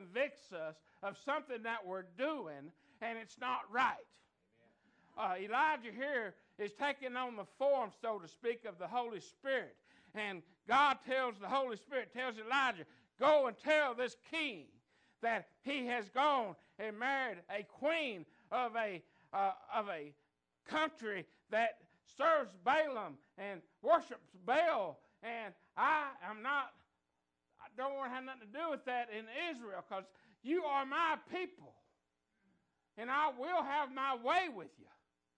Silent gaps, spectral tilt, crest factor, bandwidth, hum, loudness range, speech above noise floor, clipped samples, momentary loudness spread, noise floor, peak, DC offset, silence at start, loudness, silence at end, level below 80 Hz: none; -4 dB/octave; 20 dB; 9.6 kHz; none; 6 LU; 48 dB; under 0.1%; 14 LU; -87 dBFS; -20 dBFS; under 0.1%; 0 s; -38 LUFS; 0.55 s; -86 dBFS